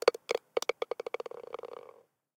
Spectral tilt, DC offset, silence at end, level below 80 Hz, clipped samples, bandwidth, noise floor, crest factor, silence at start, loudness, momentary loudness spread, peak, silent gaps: -1.5 dB/octave; under 0.1%; 0.5 s; -86 dBFS; under 0.1%; 18 kHz; -59 dBFS; 28 dB; 0.05 s; -36 LUFS; 16 LU; -8 dBFS; none